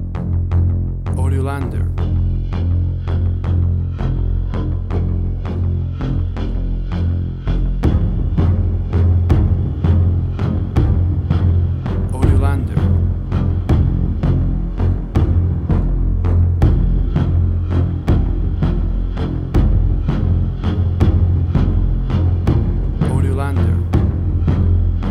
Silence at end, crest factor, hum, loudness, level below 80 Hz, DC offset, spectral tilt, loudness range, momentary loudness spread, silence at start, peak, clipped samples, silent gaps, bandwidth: 0 s; 16 dB; none; -18 LUFS; -20 dBFS; under 0.1%; -9.5 dB/octave; 3 LU; 6 LU; 0 s; 0 dBFS; under 0.1%; none; 4.5 kHz